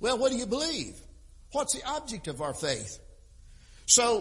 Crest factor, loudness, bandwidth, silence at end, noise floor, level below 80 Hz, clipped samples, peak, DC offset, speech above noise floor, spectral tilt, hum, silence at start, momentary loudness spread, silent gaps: 24 dB; -28 LUFS; 11.5 kHz; 0 s; -52 dBFS; -52 dBFS; under 0.1%; -6 dBFS; under 0.1%; 24 dB; -2 dB/octave; none; 0 s; 18 LU; none